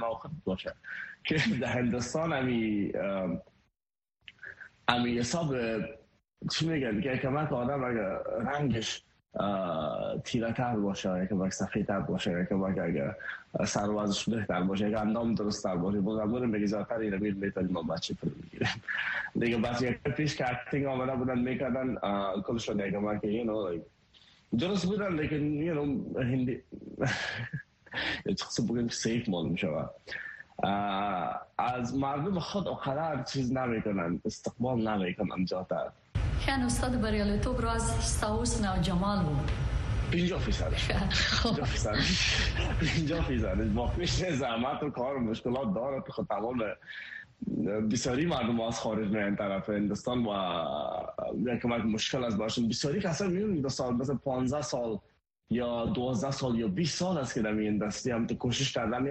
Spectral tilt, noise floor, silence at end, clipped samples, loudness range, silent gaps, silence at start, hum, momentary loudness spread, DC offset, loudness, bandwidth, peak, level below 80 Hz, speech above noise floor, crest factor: -5 dB/octave; under -90 dBFS; 0 s; under 0.1%; 3 LU; none; 0 s; none; 6 LU; under 0.1%; -31 LUFS; 10.5 kHz; -8 dBFS; -44 dBFS; over 59 dB; 22 dB